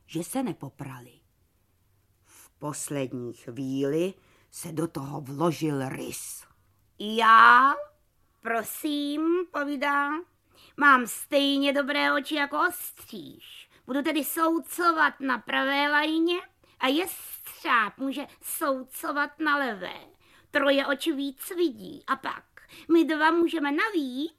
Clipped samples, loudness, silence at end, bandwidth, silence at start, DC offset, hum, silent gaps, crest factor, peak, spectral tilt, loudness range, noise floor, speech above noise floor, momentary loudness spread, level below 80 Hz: under 0.1%; -25 LUFS; 0.1 s; 15.5 kHz; 0.1 s; under 0.1%; none; none; 22 dB; -4 dBFS; -3.5 dB/octave; 10 LU; -68 dBFS; 42 dB; 16 LU; -70 dBFS